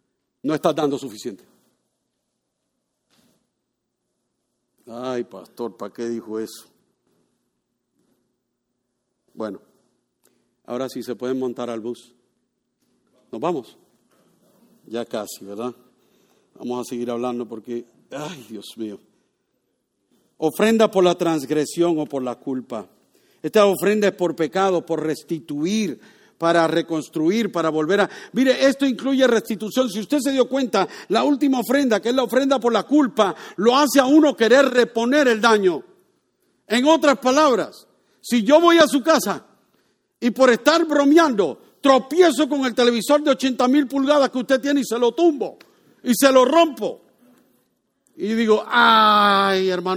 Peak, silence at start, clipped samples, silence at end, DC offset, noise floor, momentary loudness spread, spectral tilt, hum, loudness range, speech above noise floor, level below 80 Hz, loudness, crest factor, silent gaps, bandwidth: 0 dBFS; 0.45 s; under 0.1%; 0 s; under 0.1%; -77 dBFS; 17 LU; -4 dB/octave; none; 17 LU; 58 dB; -68 dBFS; -19 LUFS; 20 dB; none; 18 kHz